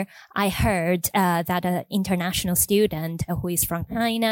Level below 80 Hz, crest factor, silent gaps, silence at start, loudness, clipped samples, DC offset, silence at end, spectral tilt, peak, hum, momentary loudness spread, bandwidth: -42 dBFS; 16 dB; none; 0 s; -23 LUFS; under 0.1%; under 0.1%; 0 s; -4.5 dB/octave; -8 dBFS; none; 6 LU; 17 kHz